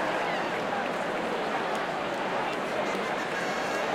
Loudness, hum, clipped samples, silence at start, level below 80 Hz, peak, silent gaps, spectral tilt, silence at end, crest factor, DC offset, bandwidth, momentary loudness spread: -30 LUFS; none; under 0.1%; 0 s; -64 dBFS; -18 dBFS; none; -4 dB/octave; 0 s; 12 dB; under 0.1%; 16 kHz; 1 LU